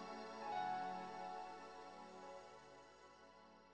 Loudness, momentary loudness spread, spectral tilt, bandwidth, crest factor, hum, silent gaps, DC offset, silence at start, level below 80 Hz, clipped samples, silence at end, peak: -50 LUFS; 19 LU; -4.5 dB/octave; 9.6 kHz; 16 dB; 60 Hz at -80 dBFS; none; under 0.1%; 0 s; -80 dBFS; under 0.1%; 0 s; -34 dBFS